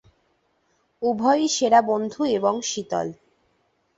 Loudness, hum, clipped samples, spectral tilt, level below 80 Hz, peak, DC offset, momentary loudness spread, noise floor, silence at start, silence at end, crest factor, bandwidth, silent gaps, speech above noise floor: -22 LUFS; none; under 0.1%; -3.5 dB/octave; -66 dBFS; -6 dBFS; under 0.1%; 10 LU; -68 dBFS; 1 s; 0.85 s; 18 dB; 8 kHz; none; 46 dB